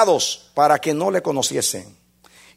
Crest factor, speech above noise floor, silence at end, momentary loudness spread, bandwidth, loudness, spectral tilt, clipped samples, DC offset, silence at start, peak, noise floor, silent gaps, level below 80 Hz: 18 dB; 32 dB; 0.7 s; 5 LU; 16 kHz; -19 LUFS; -3 dB/octave; under 0.1%; under 0.1%; 0 s; -2 dBFS; -51 dBFS; none; -64 dBFS